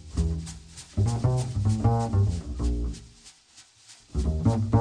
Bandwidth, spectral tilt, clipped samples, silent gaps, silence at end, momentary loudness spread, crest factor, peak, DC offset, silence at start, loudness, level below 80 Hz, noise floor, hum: 10 kHz; -7.5 dB/octave; under 0.1%; none; 0 s; 12 LU; 16 dB; -10 dBFS; under 0.1%; 0.05 s; -27 LUFS; -34 dBFS; -55 dBFS; none